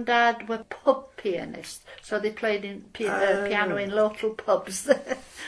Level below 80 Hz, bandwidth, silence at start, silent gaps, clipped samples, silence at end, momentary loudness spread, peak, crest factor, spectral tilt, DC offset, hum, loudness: -62 dBFS; 11 kHz; 0 s; none; under 0.1%; 0 s; 11 LU; -6 dBFS; 20 dB; -3.5 dB/octave; under 0.1%; none; -26 LUFS